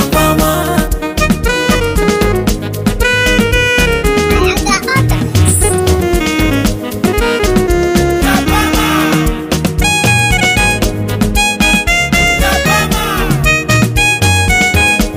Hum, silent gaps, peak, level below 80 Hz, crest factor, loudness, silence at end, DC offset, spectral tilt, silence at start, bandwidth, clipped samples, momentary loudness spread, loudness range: none; none; 0 dBFS; -20 dBFS; 10 dB; -11 LUFS; 0 s; under 0.1%; -4 dB/octave; 0 s; 16.5 kHz; under 0.1%; 5 LU; 2 LU